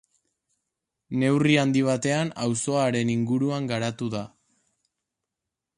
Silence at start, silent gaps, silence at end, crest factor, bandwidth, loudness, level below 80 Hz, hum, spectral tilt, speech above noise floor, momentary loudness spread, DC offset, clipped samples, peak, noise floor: 1.1 s; none; 1.5 s; 18 dB; 11.5 kHz; -24 LUFS; -64 dBFS; none; -5.5 dB/octave; 62 dB; 11 LU; under 0.1%; under 0.1%; -8 dBFS; -86 dBFS